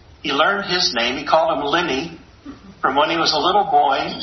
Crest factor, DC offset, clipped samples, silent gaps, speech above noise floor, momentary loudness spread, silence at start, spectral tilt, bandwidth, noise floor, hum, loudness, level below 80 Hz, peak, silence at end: 18 dB; under 0.1%; under 0.1%; none; 21 dB; 7 LU; 0.25 s; -3 dB/octave; 6.4 kHz; -39 dBFS; none; -18 LUFS; -52 dBFS; -2 dBFS; 0 s